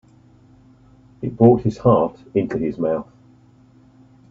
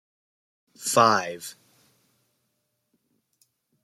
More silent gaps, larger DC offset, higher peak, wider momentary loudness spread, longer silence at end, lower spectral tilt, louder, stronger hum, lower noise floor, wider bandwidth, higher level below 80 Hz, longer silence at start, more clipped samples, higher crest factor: neither; neither; first, 0 dBFS vs -4 dBFS; second, 12 LU vs 20 LU; second, 1.25 s vs 2.3 s; first, -10 dB/octave vs -3 dB/octave; first, -19 LUFS vs -22 LUFS; neither; second, -51 dBFS vs -76 dBFS; second, 7.4 kHz vs 16 kHz; first, -50 dBFS vs -76 dBFS; first, 1.2 s vs 0.8 s; neither; about the same, 20 dB vs 24 dB